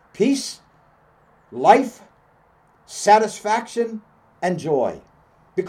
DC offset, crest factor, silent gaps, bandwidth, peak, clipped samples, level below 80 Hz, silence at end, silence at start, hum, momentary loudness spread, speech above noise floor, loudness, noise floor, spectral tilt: under 0.1%; 22 dB; none; 15.5 kHz; 0 dBFS; under 0.1%; -64 dBFS; 0 s; 0.2 s; none; 21 LU; 38 dB; -20 LUFS; -57 dBFS; -4.5 dB/octave